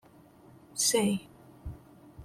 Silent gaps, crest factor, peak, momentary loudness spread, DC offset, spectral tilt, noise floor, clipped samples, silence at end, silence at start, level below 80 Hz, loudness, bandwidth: none; 20 dB; -14 dBFS; 22 LU; under 0.1%; -3 dB/octave; -56 dBFS; under 0.1%; 0 s; 0.75 s; -56 dBFS; -28 LUFS; 16.5 kHz